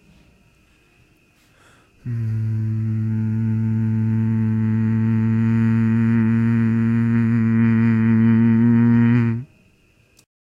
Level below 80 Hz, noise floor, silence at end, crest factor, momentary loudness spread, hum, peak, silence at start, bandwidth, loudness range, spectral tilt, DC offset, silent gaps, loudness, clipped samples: -50 dBFS; -57 dBFS; 1.05 s; 14 dB; 8 LU; none; -6 dBFS; 2.05 s; 3.2 kHz; 8 LU; -10.5 dB/octave; under 0.1%; none; -18 LUFS; under 0.1%